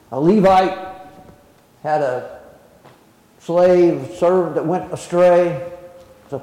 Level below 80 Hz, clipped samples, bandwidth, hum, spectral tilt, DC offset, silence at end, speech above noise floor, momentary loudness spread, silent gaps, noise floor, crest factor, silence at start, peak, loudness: -52 dBFS; under 0.1%; 11.5 kHz; none; -7 dB/octave; under 0.1%; 0 s; 35 dB; 19 LU; none; -51 dBFS; 12 dB; 0.1 s; -6 dBFS; -16 LUFS